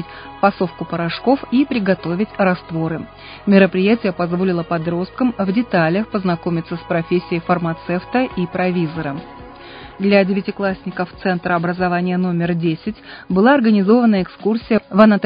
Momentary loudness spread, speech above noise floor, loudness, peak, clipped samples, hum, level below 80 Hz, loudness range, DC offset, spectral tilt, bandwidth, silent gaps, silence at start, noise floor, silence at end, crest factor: 12 LU; 20 dB; -18 LUFS; 0 dBFS; under 0.1%; none; -48 dBFS; 4 LU; under 0.1%; -11 dB/octave; 5.2 kHz; none; 0 s; -36 dBFS; 0 s; 18 dB